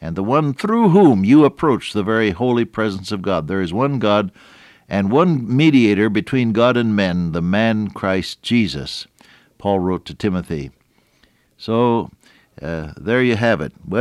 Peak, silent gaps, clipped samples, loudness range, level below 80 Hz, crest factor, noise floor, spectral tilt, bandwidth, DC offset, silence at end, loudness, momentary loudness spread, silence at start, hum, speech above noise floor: -2 dBFS; none; under 0.1%; 7 LU; -48 dBFS; 14 dB; -58 dBFS; -7 dB/octave; 12 kHz; under 0.1%; 0 s; -17 LUFS; 15 LU; 0 s; none; 41 dB